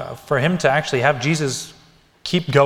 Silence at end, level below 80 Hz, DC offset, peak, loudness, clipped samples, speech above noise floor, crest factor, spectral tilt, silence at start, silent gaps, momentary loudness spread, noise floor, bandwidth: 0 s; -52 dBFS; under 0.1%; 0 dBFS; -19 LUFS; under 0.1%; 34 dB; 18 dB; -5 dB/octave; 0 s; none; 11 LU; -52 dBFS; 16 kHz